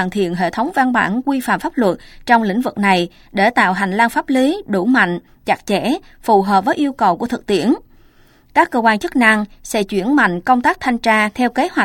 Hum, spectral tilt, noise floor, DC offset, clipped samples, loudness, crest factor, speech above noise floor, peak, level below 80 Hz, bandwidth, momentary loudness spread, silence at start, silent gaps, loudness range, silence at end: none; -5 dB/octave; -49 dBFS; under 0.1%; under 0.1%; -16 LUFS; 16 dB; 33 dB; 0 dBFS; -48 dBFS; 17 kHz; 6 LU; 0 s; none; 2 LU; 0 s